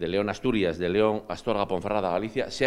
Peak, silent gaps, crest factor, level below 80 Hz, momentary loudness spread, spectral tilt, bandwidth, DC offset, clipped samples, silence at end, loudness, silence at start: -8 dBFS; none; 18 dB; -52 dBFS; 5 LU; -6 dB/octave; 11.5 kHz; under 0.1%; under 0.1%; 0 s; -27 LUFS; 0 s